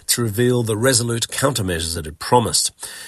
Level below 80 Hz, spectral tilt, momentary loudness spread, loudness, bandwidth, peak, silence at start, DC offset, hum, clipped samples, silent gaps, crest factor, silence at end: -46 dBFS; -3.5 dB/octave; 7 LU; -18 LUFS; 13 kHz; -2 dBFS; 0.1 s; under 0.1%; none; under 0.1%; none; 18 dB; 0 s